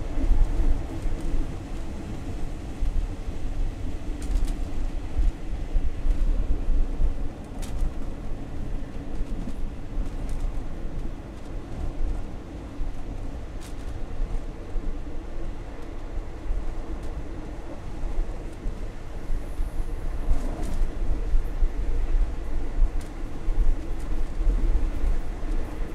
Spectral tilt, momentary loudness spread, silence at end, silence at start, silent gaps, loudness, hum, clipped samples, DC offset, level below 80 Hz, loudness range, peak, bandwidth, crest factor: -7 dB/octave; 9 LU; 0 s; 0 s; none; -33 LUFS; none; under 0.1%; under 0.1%; -26 dBFS; 6 LU; -8 dBFS; 9 kHz; 16 dB